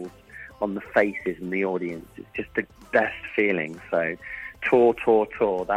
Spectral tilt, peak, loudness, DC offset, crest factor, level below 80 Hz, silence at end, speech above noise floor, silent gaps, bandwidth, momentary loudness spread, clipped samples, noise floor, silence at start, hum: -7 dB/octave; -6 dBFS; -25 LUFS; under 0.1%; 20 dB; -56 dBFS; 0 s; 21 dB; none; 11 kHz; 16 LU; under 0.1%; -45 dBFS; 0 s; none